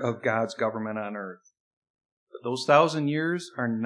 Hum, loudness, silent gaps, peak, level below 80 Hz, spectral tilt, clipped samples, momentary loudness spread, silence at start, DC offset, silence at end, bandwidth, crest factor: none; -26 LUFS; 1.60-1.82 s, 1.90-1.94 s, 2.05-2.27 s; -6 dBFS; -86 dBFS; -5.5 dB/octave; under 0.1%; 15 LU; 0 s; under 0.1%; 0 s; 10.5 kHz; 22 dB